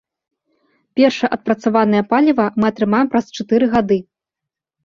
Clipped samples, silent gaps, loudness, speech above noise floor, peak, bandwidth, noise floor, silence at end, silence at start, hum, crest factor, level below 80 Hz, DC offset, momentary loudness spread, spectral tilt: under 0.1%; none; -16 LUFS; 69 dB; -2 dBFS; 7.2 kHz; -84 dBFS; 0.85 s; 0.95 s; none; 16 dB; -54 dBFS; under 0.1%; 5 LU; -6.5 dB/octave